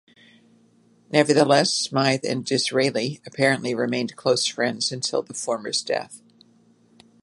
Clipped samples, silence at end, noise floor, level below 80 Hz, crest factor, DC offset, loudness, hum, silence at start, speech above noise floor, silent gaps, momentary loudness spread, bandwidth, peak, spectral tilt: under 0.1%; 1.05 s; -58 dBFS; -72 dBFS; 22 dB; under 0.1%; -22 LUFS; none; 1.1 s; 36 dB; none; 10 LU; 11.5 kHz; -2 dBFS; -3.5 dB/octave